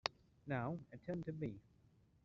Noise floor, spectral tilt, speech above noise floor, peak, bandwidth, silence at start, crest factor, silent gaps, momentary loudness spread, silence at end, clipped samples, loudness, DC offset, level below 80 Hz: -71 dBFS; -4.5 dB/octave; 27 dB; -18 dBFS; 7.4 kHz; 0.05 s; 28 dB; none; 11 LU; 0.65 s; under 0.1%; -46 LUFS; under 0.1%; -72 dBFS